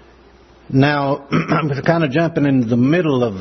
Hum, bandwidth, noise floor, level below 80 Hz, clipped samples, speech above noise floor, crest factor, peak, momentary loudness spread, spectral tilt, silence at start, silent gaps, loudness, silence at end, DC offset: none; 6.4 kHz; -46 dBFS; -50 dBFS; under 0.1%; 31 dB; 16 dB; 0 dBFS; 4 LU; -8 dB/octave; 0.7 s; none; -16 LUFS; 0 s; under 0.1%